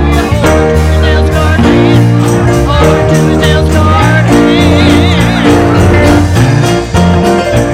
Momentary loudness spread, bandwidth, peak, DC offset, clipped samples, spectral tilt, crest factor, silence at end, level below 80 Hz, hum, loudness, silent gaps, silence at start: 3 LU; 15.5 kHz; 0 dBFS; under 0.1%; under 0.1%; -6.5 dB/octave; 6 dB; 0 s; -16 dBFS; none; -7 LUFS; none; 0 s